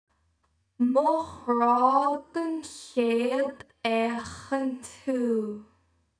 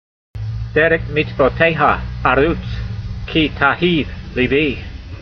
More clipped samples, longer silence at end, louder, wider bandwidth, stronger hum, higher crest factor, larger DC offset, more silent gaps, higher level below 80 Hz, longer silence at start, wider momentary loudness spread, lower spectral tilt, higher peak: neither; first, 0.55 s vs 0 s; second, -27 LUFS vs -16 LUFS; first, 10.5 kHz vs 6.6 kHz; neither; about the same, 18 dB vs 18 dB; neither; neither; second, -68 dBFS vs -30 dBFS; first, 0.8 s vs 0.35 s; about the same, 11 LU vs 13 LU; second, -5 dB/octave vs -8 dB/octave; second, -10 dBFS vs 0 dBFS